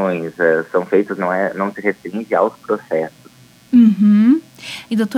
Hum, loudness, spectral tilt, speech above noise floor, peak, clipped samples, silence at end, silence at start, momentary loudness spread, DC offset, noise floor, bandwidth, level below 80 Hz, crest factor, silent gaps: none; -16 LUFS; -7.5 dB/octave; 30 dB; -2 dBFS; under 0.1%; 0 s; 0 s; 12 LU; under 0.1%; -45 dBFS; 12 kHz; -66 dBFS; 14 dB; none